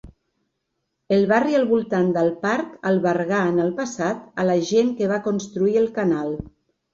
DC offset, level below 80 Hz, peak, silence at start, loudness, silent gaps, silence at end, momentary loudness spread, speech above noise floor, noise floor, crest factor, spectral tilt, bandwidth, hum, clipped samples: under 0.1%; -54 dBFS; -6 dBFS; 0.05 s; -21 LUFS; none; 0.45 s; 7 LU; 56 dB; -76 dBFS; 16 dB; -6.5 dB/octave; 7.8 kHz; none; under 0.1%